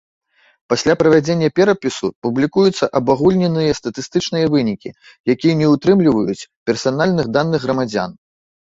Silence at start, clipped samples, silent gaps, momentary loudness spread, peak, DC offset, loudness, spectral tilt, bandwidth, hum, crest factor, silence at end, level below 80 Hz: 0.7 s; under 0.1%; 2.16-2.22 s, 5.20-5.24 s, 6.56-6.66 s; 9 LU; -2 dBFS; under 0.1%; -16 LUFS; -6 dB/octave; 8 kHz; none; 14 dB; 0.55 s; -50 dBFS